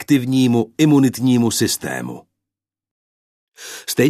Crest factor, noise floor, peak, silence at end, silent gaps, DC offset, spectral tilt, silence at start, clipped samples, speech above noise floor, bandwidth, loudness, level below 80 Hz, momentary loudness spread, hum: 16 dB; -86 dBFS; -2 dBFS; 0 s; 2.91-3.52 s; under 0.1%; -5 dB/octave; 0 s; under 0.1%; 70 dB; 14 kHz; -17 LUFS; -58 dBFS; 19 LU; none